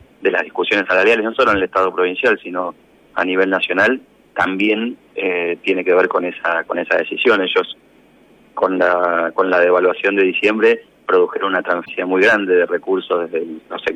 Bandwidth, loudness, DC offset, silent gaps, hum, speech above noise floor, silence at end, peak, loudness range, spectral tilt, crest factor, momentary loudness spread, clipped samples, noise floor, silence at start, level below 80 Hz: 8.8 kHz; -16 LUFS; under 0.1%; none; none; 33 dB; 0 s; -2 dBFS; 3 LU; -5 dB/octave; 14 dB; 10 LU; under 0.1%; -49 dBFS; 0.2 s; -56 dBFS